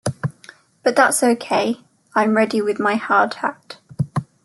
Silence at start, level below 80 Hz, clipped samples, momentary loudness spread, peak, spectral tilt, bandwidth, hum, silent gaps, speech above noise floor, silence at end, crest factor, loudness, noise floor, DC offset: 0.05 s; -62 dBFS; under 0.1%; 14 LU; -2 dBFS; -4.5 dB/octave; 12.5 kHz; none; none; 29 dB; 0.2 s; 18 dB; -19 LUFS; -47 dBFS; under 0.1%